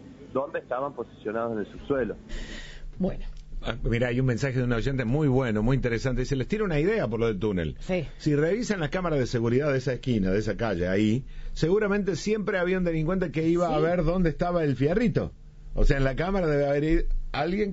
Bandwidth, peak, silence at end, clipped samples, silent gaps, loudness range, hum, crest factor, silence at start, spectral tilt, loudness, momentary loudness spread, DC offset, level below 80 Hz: 8 kHz; -8 dBFS; 0 s; under 0.1%; none; 5 LU; none; 18 dB; 0 s; -6.5 dB/octave; -27 LUFS; 9 LU; under 0.1%; -34 dBFS